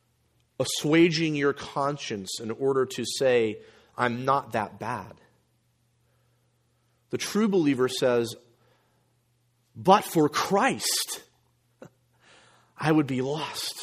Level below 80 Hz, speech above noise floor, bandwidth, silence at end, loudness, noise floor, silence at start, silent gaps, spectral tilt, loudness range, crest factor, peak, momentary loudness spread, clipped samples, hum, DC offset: -68 dBFS; 44 dB; 15.5 kHz; 0 s; -26 LUFS; -69 dBFS; 0.6 s; none; -4.5 dB/octave; 6 LU; 24 dB; -4 dBFS; 13 LU; under 0.1%; none; under 0.1%